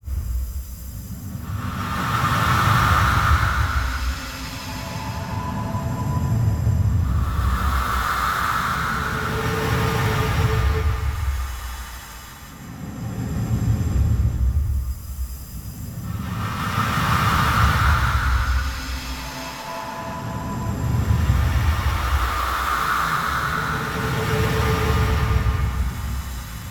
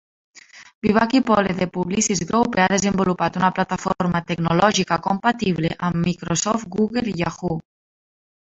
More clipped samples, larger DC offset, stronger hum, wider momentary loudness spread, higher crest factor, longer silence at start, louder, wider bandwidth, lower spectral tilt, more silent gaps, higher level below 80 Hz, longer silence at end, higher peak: neither; neither; neither; first, 14 LU vs 6 LU; about the same, 18 dB vs 20 dB; second, 0.05 s vs 0.55 s; about the same, -22 LUFS vs -20 LUFS; first, 19 kHz vs 8.2 kHz; about the same, -5.5 dB/octave vs -4.5 dB/octave; second, none vs 0.75-0.82 s; first, -26 dBFS vs -50 dBFS; second, 0 s vs 0.85 s; about the same, -4 dBFS vs -2 dBFS